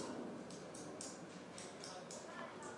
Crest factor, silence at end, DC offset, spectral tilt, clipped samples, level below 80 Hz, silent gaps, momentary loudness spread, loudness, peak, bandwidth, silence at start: 20 dB; 0 s; under 0.1%; -3.5 dB/octave; under 0.1%; -84 dBFS; none; 3 LU; -50 LUFS; -30 dBFS; 11.5 kHz; 0 s